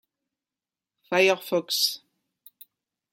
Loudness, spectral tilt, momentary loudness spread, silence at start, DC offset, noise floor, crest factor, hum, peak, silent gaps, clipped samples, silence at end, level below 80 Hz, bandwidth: -23 LUFS; -2.5 dB/octave; 6 LU; 1.1 s; under 0.1%; under -90 dBFS; 22 dB; none; -8 dBFS; none; under 0.1%; 1.15 s; -84 dBFS; 16.5 kHz